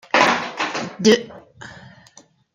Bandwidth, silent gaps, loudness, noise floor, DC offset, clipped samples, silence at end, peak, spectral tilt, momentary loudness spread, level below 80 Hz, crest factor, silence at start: 15 kHz; none; -18 LUFS; -51 dBFS; under 0.1%; under 0.1%; 0.8 s; -2 dBFS; -3.5 dB/octave; 23 LU; -64 dBFS; 20 dB; 0.15 s